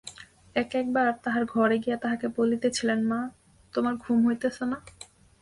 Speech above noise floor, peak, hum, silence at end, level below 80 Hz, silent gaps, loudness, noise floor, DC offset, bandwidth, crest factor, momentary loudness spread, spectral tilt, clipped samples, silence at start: 21 dB; -12 dBFS; none; 0.4 s; -62 dBFS; none; -27 LUFS; -47 dBFS; under 0.1%; 11.5 kHz; 16 dB; 11 LU; -5 dB/octave; under 0.1%; 0.05 s